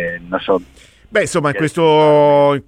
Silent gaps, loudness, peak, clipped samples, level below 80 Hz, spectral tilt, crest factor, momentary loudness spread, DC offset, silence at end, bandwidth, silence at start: none; -14 LUFS; -2 dBFS; under 0.1%; -50 dBFS; -5.5 dB/octave; 12 dB; 10 LU; under 0.1%; 0.05 s; 13 kHz; 0 s